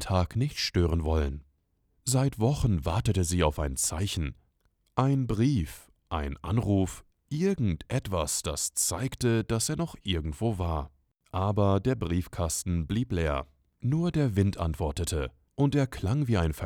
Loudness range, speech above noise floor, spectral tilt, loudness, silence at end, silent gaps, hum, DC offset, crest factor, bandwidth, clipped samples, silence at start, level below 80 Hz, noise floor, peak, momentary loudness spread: 2 LU; 44 dB; -5.5 dB/octave; -29 LUFS; 0 s; none; none; under 0.1%; 18 dB; 18 kHz; under 0.1%; 0 s; -42 dBFS; -71 dBFS; -10 dBFS; 8 LU